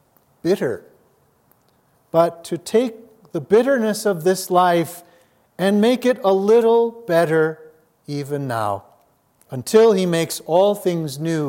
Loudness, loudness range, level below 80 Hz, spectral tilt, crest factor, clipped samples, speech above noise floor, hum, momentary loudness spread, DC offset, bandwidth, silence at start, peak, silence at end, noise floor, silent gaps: -19 LUFS; 4 LU; -70 dBFS; -5.5 dB/octave; 18 dB; under 0.1%; 42 dB; none; 15 LU; under 0.1%; 17 kHz; 0.45 s; -2 dBFS; 0 s; -60 dBFS; none